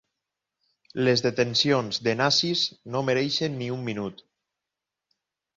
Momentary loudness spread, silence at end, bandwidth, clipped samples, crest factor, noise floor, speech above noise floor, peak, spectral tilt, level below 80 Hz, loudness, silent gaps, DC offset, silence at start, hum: 10 LU; 1.45 s; 7.8 kHz; under 0.1%; 20 dB; -87 dBFS; 62 dB; -8 dBFS; -4.5 dB/octave; -66 dBFS; -24 LUFS; none; under 0.1%; 0.95 s; none